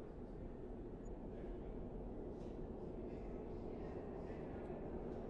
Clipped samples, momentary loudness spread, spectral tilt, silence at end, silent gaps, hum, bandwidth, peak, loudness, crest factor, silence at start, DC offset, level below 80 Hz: under 0.1%; 3 LU; -9.5 dB/octave; 0 s; none; none; 7.6 kHz; -36 dBFS; -50 LUFS; 12 dB; 0 s; under 0.1%; -54 dBFS